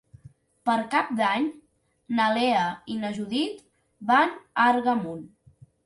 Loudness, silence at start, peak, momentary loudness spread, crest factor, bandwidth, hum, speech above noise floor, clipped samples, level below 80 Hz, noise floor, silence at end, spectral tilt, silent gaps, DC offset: -25 LUFS; 0.65 s; -6 dBFS; 10 LU; 20 dB; 11.5 kHz; none; 34 dB; under 0.1%; -68 dBFS; -58 dBFS; 0.6 s; -5 dB/octave; none; under 0.1%